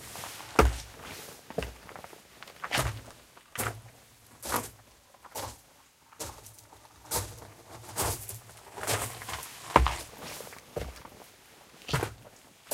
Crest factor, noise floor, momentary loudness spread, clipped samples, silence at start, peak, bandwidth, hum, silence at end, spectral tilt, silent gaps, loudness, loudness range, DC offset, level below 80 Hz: 32 dB; -60 dBFS; 25 LU; under 0.1%; 0 s; -2 dBFS; 16.5 kHz; none; 0 s; -3.5 dB/octave; none; -33 LUFS; 7 LU; under 0.1%; -42 dBFS